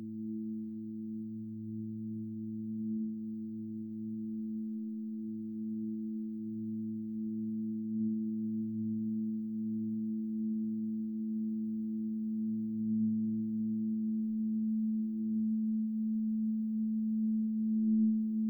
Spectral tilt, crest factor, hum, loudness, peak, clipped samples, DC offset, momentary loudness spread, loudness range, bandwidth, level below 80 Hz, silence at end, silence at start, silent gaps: -14 dB/octave; 12 dB; none; -36 LUFS; -22 dBFS; under 0.1%; under 0.1%; 8 LU; 6 LU; 0.6 kHz; -78 dBFS; 0 s; 0 s; none